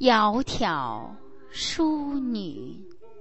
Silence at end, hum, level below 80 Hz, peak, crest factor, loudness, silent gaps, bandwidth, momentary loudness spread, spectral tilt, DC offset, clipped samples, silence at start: 0 s; none; -48 dBFS; -6 dBFS; 20 dB; -26 LUFS; none; 8.4 kHz; 19 LU; -4 dB/octave; 0.8%; under 0.1%; 0 s